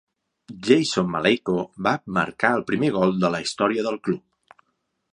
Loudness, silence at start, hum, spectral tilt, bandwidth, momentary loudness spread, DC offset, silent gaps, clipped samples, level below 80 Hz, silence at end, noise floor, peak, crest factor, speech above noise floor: -22 LUFS; 0.5 s; none; -5 dB/octave; 11 kHz; 7 LU; under 0.1%; none; under 0.1%; -60 dBFS; 0.95 s; -74 dBFS; -2 dBFS; 22 dB; 52 dB